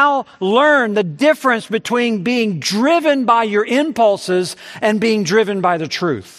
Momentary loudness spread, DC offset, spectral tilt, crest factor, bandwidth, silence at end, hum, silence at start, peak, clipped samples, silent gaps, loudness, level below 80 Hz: 6 LU; under 0.1%; -4.5 dB/octave; 16 dB; 14 kHz; 0.15 s; none; 0 s; 0 dBFS; under 0.1%; none; -16 LUFS; -66 dBFS